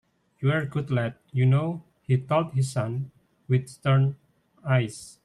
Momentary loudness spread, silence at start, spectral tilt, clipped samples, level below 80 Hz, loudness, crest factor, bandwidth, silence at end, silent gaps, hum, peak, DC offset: 11 LU; 0.4 s; -7 dB/octave; under 0.1%; -62 dBFS; -26 LUFS; 16 dB; 11.5 kHz; 0.15 s; none; none; -10 dBFS; under 0.1%